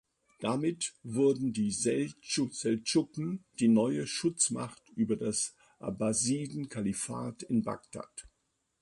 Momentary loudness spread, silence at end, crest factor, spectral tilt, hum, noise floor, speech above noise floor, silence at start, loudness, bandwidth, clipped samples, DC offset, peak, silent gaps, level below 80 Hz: 11 LU; 0.55 s; 18 dB; -4.5 dB/octave; none; -79 dBFS; 48 dB; 0.4 s; -32 LUFS; 11.5 kHz; under 0.1%; under 0.1%; -14 dBFS; none; -66 dBFS